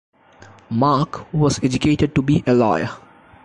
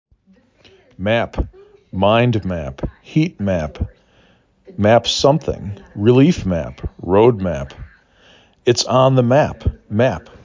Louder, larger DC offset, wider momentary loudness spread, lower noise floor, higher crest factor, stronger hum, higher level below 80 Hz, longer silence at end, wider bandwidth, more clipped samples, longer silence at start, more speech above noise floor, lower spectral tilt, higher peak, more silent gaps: about the same, -19 LUFS vs -17 LUFS; neither; second, 9 LU vs 16 LU; second, -46 dBFS vs -54 dBFS; about the same, 14 dB vs 16 dB; neither; second, -42 dBFS vs -34 dBFS; first, 0.45 s vs 0.25 s; first, 11 kHz vs 7.6 kHz; neither; second, 0.7 s vs 1 s; second, 29 dB vs 38 dB; about the same, -6.5 dB/octave vs -6 dB/octave; second, -6 dBFS vs 0 dBFS; neither